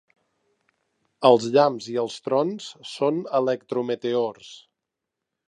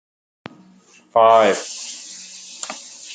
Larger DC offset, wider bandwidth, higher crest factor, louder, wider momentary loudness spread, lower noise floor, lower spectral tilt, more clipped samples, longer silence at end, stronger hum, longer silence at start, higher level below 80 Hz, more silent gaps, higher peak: neither; first, 10.5 kHz vs 9.4 kHz; about the same, 24 dB vs 20 dB; second, -23 LUFS vs -16 LUFS; second, 14 LU vs 22 LU; first, -84 dBFS vs -51 dBFS; first, -5.5 dB/octave vs -2.5 dB/octave; neither; first, 0.9 s vs 0 s; neither; about the same, 1.2 s vs 1.15 s; about the same, -78 dBFS vs -74 dBFS; neither; about the same, -2 dBFS vs -2 dBFS